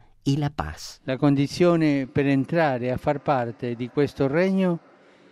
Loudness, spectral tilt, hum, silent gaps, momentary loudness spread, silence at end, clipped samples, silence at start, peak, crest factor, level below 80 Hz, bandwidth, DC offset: -23 LUFS; -7 dB/octave; none; none; 10 LU; 0.55 s; under 0.1%; 0.25 s; -8 dBFS; 16 dB; -50 dBFS; 13 kHz; under 0.1%